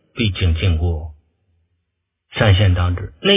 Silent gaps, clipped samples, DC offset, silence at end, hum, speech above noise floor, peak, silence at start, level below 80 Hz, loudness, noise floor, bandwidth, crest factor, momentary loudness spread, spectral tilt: none; under 0.1%; under 0.1%; 0 s; none; 58 dB; 0 dBFS; 0.15 s; -26 dBFS; -18 LUFS; -74 dBFS; 3.8 kHz; 18 dB; 14 LU; -10.5 dB/octave